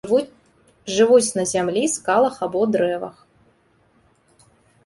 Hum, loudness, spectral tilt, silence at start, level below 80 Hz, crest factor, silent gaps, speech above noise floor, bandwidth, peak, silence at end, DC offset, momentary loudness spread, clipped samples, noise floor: none; -19 LUFS; -4 dB/octave; 0.05 s; -60 dBFS; 18 dB; none; 41 dB; 11.5 kHz; -4 dBFS; 1.75 s; under 0.1%; 15 LU; under 0.1%; -60 dBFS